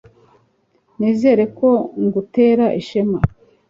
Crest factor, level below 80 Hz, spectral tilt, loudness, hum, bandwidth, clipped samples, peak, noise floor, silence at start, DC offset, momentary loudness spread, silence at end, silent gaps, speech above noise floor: 16 dB; -42 dBFS; -9 dB/octave; -17 LUFS; none; 7.4 kHz; under 0.1%; -2 dBFS; -61 dBFS; 1 s; under 0.1%; 7 LU; 0.4 s; none; 45 dB